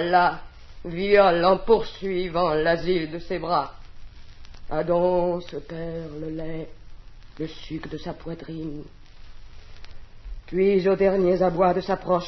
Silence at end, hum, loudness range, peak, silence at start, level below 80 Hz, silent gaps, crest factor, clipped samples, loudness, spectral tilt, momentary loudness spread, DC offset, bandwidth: 0 s; none; 15 LU; -4 dBFS; 0 s; -42 dBFS; none; 20 dB; under 0.1%; -23 LUFS; -7.5 dB/octave; 16 LU; under 0.1%; 6.2 kHz